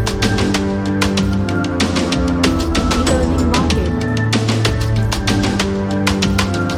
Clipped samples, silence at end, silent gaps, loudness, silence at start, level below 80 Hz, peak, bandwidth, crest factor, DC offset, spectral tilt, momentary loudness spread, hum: under 0.1%; 0 s; none; -16 LUFS; 0 s; -26 dBFS; 0 dBFS; 15.5 kHz; 16 dB; under 0.1%; -5 dB/octave; 3 LU; none